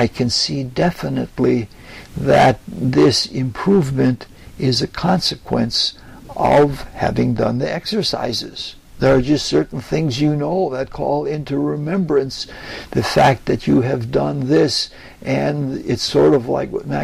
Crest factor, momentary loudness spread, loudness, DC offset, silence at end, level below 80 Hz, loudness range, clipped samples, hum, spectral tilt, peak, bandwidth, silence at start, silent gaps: 14 dB; 10 LU; -18 LUFS; under 0.1%; 0 s; -40 dBFS; 2 LU; under 0.1%; none; -5.5 dB/octave; -4 dBFS; 15 kHz; 0 s; none